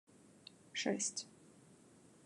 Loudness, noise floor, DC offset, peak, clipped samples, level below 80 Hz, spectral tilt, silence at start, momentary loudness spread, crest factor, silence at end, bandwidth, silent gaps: -40 LUFS; -64 dBFS; under 0.1%; -22 dBFS; under 0.1%; -90 dBFS; -2 dB/octave; 0.25 s; 25 LU; 24 dB; 0.2 s; 11.5 kHz; none